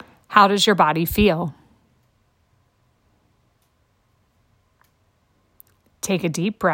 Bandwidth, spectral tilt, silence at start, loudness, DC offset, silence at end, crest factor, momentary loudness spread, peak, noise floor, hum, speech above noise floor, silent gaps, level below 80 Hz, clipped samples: 16.5 kHz; -4.5 dB/octave; 0.3 s; -19 LUFS; under 0.1%; 0 s; 22 dB; 11 LU; 0 dBFS; -64 dBFS; none; 47 dB; none; -46 dBFS; under 0.1%